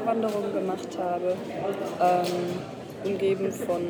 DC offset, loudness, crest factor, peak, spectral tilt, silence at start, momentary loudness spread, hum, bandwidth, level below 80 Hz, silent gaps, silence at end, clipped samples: under 0.1%; -28 LUFS; 16 dB; -10 dBFS; -6 dB/octave; 0 s; 8 LU; none; over 20 kHz; -68 dBFS; none; 0 s; under 0.1%